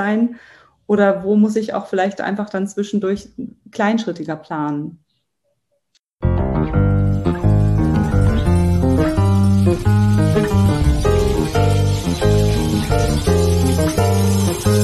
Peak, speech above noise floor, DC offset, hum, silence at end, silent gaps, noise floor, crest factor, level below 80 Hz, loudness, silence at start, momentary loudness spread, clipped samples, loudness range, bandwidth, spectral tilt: -2 dBFS; 51 dB; under 0.1%; none; 0 s; 5.99-6.03 s; -70 dBFS; 14 dB; -26 dBFS; -17 LUFS; 0 s; 8 LU; under 0.1%; 7 LU; 13 kHz; -7 dB/octave